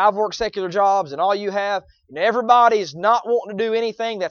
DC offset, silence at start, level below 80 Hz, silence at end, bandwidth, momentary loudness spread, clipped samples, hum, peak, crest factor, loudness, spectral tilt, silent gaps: under 0.1%; 0 s; -56 dBFS; 0 s; 7 kHz; 10 LU; under 0.1%; none; -2 dBFS; 18 dB; -19 LUFS; -4 dB/octave; none